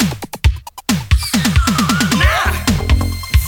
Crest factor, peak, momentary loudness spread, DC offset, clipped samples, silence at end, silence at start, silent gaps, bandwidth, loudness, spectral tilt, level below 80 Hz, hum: 14 dB; 0 dBFS; 6 LU; under 0.1%; under 0.1%; 0 s; 0 s; none; 19.5 kHz; -15 LUFS; -4.5 dB/octave; -18 dBFS; none